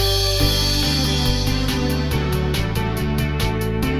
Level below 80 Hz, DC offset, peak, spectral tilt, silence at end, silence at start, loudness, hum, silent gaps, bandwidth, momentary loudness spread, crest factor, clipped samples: -26 dBFS; 1%; -4 dBFS; -4.5 dB/octave; 0 s; 0 s; -20 LUFS; none; none; 19 kHz; 5 LU; 14 dB; under 0.1%